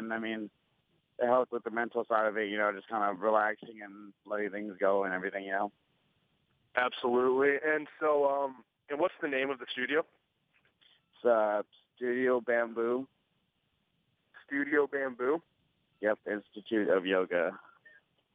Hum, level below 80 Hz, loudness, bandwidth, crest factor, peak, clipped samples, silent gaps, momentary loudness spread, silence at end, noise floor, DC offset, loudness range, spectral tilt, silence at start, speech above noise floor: none; -84 dBFS; -32 LUFS; 4.9 kHz; 22 dB; -10 dBFS; under 0.1%; none; 11 LU; 0.75 s; -78 dBFS; under 0.1%; 4 LU; -7.5 dB/octave; 0 s; 46 dB